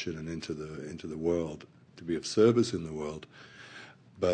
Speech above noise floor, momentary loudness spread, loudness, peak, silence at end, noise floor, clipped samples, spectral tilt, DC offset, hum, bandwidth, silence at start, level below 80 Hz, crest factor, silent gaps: 20 dB; 24 LU; -31 LUFS; -12 dBFS; 0 s; -51 dBFS; under 0.1%; -6 dB/octave; under 0.1%; none; 9.8 kHz; 0 s; -60 dBFS; 20 dB; none